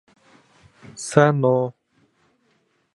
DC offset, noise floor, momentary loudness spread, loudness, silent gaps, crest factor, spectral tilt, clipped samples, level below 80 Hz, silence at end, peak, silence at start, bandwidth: under 0.1%; -66 dBFS; 17 LU; -19 LUFS; none; 24 dB; -6.5 dB/octave; under 0.1%; -66 dBFS; 1.25 s; 0 dBFS; 0.95 s; 11.5 kHz